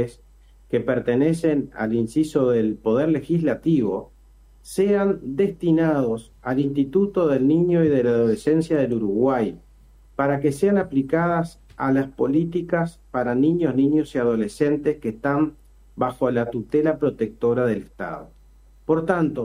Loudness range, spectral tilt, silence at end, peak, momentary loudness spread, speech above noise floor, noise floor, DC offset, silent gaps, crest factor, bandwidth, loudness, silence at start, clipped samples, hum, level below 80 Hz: 3 LU; -8 dB/octave; 0 s; -6 dBFS; 8 LU; 30 dB; -51 dBFS; under 0.1%; none; 16 dB; 12.5 kHz; -22 LUFS; 0 s; under 0.1%; none; -50 dBFS